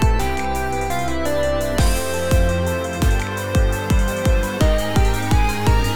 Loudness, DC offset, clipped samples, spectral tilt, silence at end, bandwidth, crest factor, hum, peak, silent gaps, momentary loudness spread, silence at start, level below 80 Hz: -20 LUFS; 4%; under 0.1%; -5.5 dB/octave; 0 s; over 20 kHz; 14 dB; none; -4 dBFS; none; 4 LU; 0 s; -22 dBFS